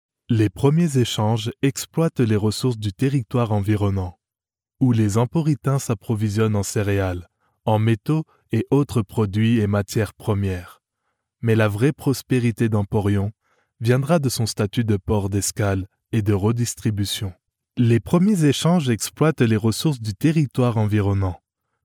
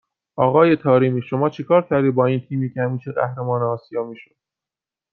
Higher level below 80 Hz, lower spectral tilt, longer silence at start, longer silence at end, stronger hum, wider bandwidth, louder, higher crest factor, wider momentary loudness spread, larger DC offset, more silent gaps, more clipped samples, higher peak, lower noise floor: first, -50 dBFS vs -64 dBFS; second, -6.5 dB/octave vs -10 dB/octave; about the same, 0.3 s vs 0.35 s; second, 0.5 s vs 0.9 s; neither; first, 18.5 kHz vs 6 kHz; about the same, -21 LUFS vs -19 LUFS; about the same, 16 dB vs 18 dB; second, 7 LU vs 11 LU; neither; neither; neither; about the same, -4 dBFS vs -2 dBFS; about the same, under -90 dBFS vs -89 dBFS